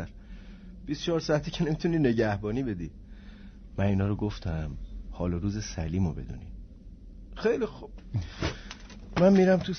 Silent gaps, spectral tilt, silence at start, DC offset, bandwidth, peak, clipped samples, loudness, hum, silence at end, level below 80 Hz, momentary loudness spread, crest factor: none; -7 dB/octave; 0 s; under 0.1%; 6.6 kHz; -10 dBFS; under 0.1%; -29 LUFS; none; 0 s; -44 dBFS; 23 LU; 20 dB